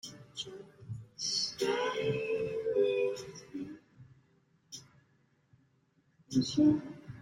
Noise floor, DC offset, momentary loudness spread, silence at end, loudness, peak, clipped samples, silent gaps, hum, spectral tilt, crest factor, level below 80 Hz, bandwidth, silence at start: -71 dBFS; under 0.1%; 21 LU; 0 s; -33 LUFS; -16 dBFS; under 0.1%; none; none; -4.5 dB/octave; 18 dB; -70 dBFS; 16 kHz; 0.05 s